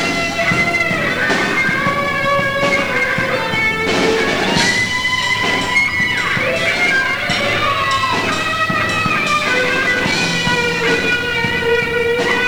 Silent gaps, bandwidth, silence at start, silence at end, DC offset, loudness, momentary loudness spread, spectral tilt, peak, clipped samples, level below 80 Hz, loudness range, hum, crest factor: none; over 20 kHz; 0 s; 0 s; 1%; -15 LUFS; 2 LU; -3.5 dB/octave; -2 dBFS; under 0.1%; -42 dBFS; 1 LU; none; 16 dB